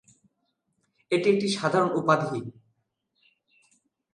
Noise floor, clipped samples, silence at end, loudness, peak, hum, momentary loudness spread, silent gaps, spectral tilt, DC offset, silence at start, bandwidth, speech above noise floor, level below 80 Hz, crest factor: -77 dBFS; under 0.1%; 1.65 s; -25 LUFS; -6 dBFS; none; 11 LU; none; -5.5 dB/octave; under 0.1%; 1.1 s; 11 kHz; 52 dB; -74 dBFS; 22 dB